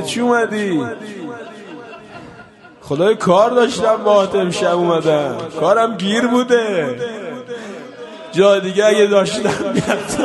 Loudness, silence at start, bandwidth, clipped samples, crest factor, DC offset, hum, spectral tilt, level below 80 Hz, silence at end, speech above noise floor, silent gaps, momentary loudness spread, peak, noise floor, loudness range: -15 LUFS; 0 s; 11.5 kHz; under 0.1%; 16 dB; under 0.1%; none; -5 dB/octave; -54 dBFS; 0 s; 26 dB; none; 20 LU; 0 dBFS; -41 dBFS; 4 LU